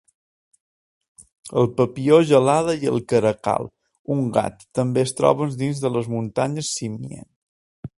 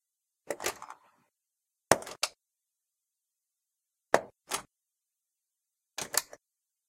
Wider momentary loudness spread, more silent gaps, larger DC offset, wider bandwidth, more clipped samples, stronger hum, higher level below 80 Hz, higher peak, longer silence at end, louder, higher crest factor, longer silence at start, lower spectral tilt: second, 14 LU vs 17 LU; first, 3.99-4.05 s, 7.36-7.83 s vs none; neither; second, 11.5 kHz vs 16.5 kHz; neither; neither; first, -58 dBFS vs -70 dBFS; about the same, 0 dBFS vs 0 dBFS; second, 0.1 s vs 0.65 s; first, -21 LUFS vs -32 LUFS; second, 22 dB vs 38 dB; first, 1.45 s vs 0.5 s; first, -6 dB/octave vs -1.5 dB/octave